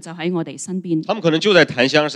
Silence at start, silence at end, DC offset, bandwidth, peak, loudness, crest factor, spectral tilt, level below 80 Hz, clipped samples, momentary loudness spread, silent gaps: 0.05 s; 0 s; under 0.1%; 11.5 kHz; 0 dBFS; -17 LUFS; 18 dB; -4.5 dB/octave; -66 dBFS; under 0.1%; 12 LU; none